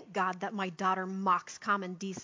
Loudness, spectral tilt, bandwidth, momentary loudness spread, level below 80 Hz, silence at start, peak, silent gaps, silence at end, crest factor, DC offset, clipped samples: -33 LUFS; -5 dB/octave; 7.6 kHz; 5 LU; -82 dBFS; 0 s; -16 dBFS; none; 0 s; 18 dB; under 0.1%; under 0.1%